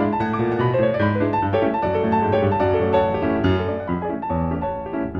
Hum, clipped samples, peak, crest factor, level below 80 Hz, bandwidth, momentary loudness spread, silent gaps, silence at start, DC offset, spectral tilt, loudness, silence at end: none; under 0.1%; -6 dBFS; 14 dB; -42 dBFS; 6 kHz; 6 LU; none; 0 s; under 0.1%; -9.5 dB/octave; -21 LUFS; 0 s